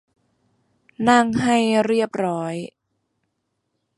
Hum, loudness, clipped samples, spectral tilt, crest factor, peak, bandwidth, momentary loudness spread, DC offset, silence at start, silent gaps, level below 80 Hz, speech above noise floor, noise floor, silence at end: none; -20 LUFS; under 0.1%; -5 dB/octave; 20 dB; -2 dBFS; 11.5 kHz; 13 LU; under 0.1%; 1 s; none; -58 dBFS; 56 dB; -75 dBFS; 1.3 s